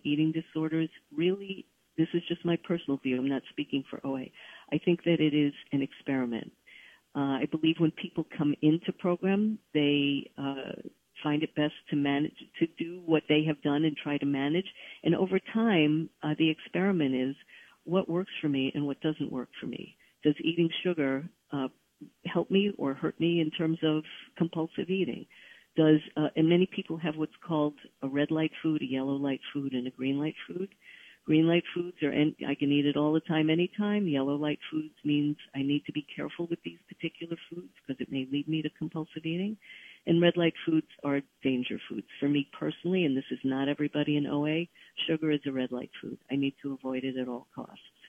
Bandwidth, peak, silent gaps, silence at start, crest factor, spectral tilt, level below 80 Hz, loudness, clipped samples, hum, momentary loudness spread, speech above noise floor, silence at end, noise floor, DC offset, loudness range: 3.7 kHz; -10 dBFS; none; 0.05 s; 20 dB; -8.5 dB/octave; -72 dBFS; -30 LUFS; under 0.1%; none; 13 LU; 26 dB; 0.3 s; -56 dBFS; under 0.1%; 4 LU